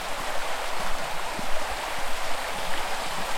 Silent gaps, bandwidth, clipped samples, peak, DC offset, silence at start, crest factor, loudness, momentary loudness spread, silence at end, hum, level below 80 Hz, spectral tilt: none; 16.5 kHz; under 0.1%; -12 dBFS; under 0.1%; 0 s; 14 dB; -30 LUFS; 1 LU; 0 s; none; -38 dBFS; -2 dB/octave